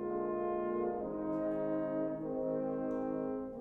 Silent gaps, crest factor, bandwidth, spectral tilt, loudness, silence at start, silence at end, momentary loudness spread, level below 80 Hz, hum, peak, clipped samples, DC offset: none; 10 dB; 3.7 kHz; -10.5 dB/octave; -37 LUFS; 0 s; 0 s; 2 LU; -64 dBFS; none; -26 dBFS; under 0.1%; under 0.1%